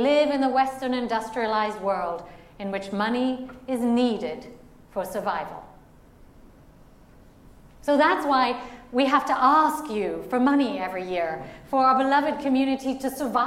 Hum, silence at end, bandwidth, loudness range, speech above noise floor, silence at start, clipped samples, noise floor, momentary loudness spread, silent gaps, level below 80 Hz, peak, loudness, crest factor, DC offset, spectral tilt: none; 0 s; 16 kHz; 9 LU; 27 dB; 0 s; under 0.1%; -51 dBFS; 13 LU; none; -56 dBFS; -8 dBFS; -24 LUFS; 18 dB; under 0.1%; -5 dB/octave